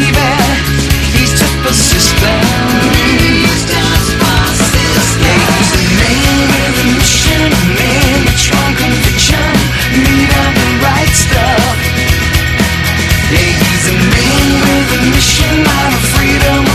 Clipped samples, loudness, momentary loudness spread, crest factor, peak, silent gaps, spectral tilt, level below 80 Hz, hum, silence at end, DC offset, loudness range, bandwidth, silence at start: 0.2%; -9 LUFS; 3 LU; 10 dB; 0 dBFS; none; -4 dB/octave; -18 dBFS; none; 0 s; under 0.1%; 1 LU; 14.5 kHz; 0 s